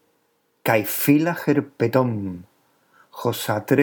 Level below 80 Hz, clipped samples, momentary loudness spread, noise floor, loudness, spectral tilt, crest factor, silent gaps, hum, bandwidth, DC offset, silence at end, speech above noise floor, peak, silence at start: -68 dBFS; under 0.1%; 10 LU; -67 dBFS; -22 LUFS; -6 dB/octave; 20 dB; none; none; over 20 kHz; under 0.1%; 0 s; 47 dB; -4 dBFS; 0.65 s